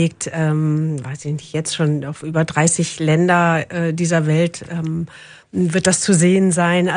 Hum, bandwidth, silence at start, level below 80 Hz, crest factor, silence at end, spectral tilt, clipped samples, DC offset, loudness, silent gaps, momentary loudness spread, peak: none; 10.5 kHz; 0 s; -56 dBFS; 18 dB; 0 s; -5 dB/octave; under 0.1%; under 0.1%; -18 LUFS; none; 11 LU; 0 dBFS